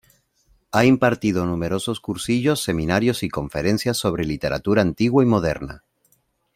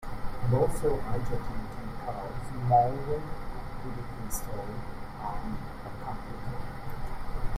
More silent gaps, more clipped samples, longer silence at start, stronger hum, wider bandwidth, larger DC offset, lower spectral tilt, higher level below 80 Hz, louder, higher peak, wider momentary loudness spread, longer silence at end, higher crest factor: neither; neither; first, 0.75 s vs 0 s; neither; about the same, 16 kHz vs 15 kHz; neither; about the same, -5.5 dB/octave vs -6.5 dB/octave; second, -46 dBFS vs -38 dBFS; first, -21 LUFS vs -33 LUFS; first, 0 dBFS vs -10 dBFS; second, 9 LU vs 14 LU; first, 0.8 s vs 0 s; about the same, 20 dB vs 20 dB